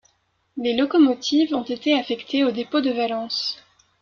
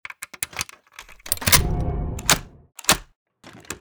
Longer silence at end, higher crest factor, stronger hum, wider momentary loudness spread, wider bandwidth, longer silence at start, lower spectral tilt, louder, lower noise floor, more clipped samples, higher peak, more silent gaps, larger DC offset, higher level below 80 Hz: first, 0.45 s vs 0 s; second, 16 dB vs 24 dB; neither; second, 9 LU vs 17 LU; second, 7.2 kHz vs over 20 kHz; first, 0.55 s vs 0.1 s; first, -3.5 dB/octave vs -2 dB/octave; about the same, -22 LUFS vs -21 LUFS; first, -67 dBFS vs -46 dBFS; neither; second, -6 dBFS vs -2 dBFS; second, none vs 3.16-3.26 s; neither; second, -66 dBFS vs -34 dBFS